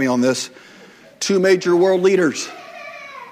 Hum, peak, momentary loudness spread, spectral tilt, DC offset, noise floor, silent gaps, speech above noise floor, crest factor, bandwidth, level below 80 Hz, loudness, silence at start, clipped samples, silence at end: none; -2 dBFS; 19 LU; -4.5 dB/octave; under 0.1%; -44 dBFS; none; 28 dB; 16 dB; 15 kHz; -68 dBFS; -17 LUFS; 0 s; under 0.1%; 0 s